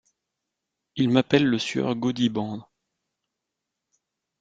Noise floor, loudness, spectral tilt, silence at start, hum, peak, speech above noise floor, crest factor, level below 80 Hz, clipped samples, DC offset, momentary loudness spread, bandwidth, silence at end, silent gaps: -84 dBFS; -24 LUFS; -6 dB/octave; 0.95 s; none; -4 dBFS; 61 dB; 24 dB; -64 dBFS; under 0.1%; under 0.1%; 14 LU; 9 kHz; 1.8 s; none